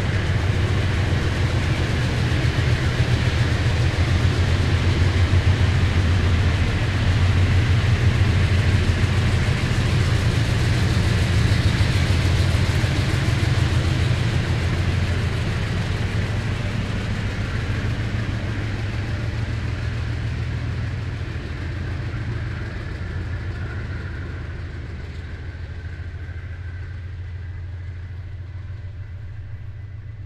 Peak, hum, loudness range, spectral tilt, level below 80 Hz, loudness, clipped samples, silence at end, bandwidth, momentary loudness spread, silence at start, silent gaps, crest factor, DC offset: -6 dBFS; none; 13 LU; -6 dB/octave; -30 dBFS; -22 LUFS; under 0.1%; 0 s; 12 kHz; 14 LU; 0 s; none; 14 dB; under 0.1%